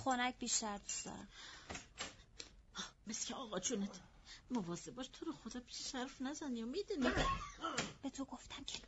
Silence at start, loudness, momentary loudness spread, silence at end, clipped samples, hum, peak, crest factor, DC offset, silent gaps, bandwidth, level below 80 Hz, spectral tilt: 0 s; -43 LUFS; 14 LU; 0 s; under 0.1%; none; -24 dBFS; 20 dB; under 0.1%; none; 8.2 kHz; -58 dBFS; -3 dB/octave